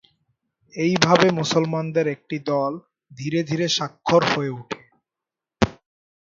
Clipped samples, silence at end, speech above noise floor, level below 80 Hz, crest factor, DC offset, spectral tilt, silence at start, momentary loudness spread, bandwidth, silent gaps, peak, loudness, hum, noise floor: under 0.1%; 0.65 s; 67 dB; -50 dBFS; 22 dB; under 0.1%; -5 dB/octave; 0.75 s; 16 LU; 7.6 kHz; none; 0 dBFS; -21 LUFS; none; -88 dBFS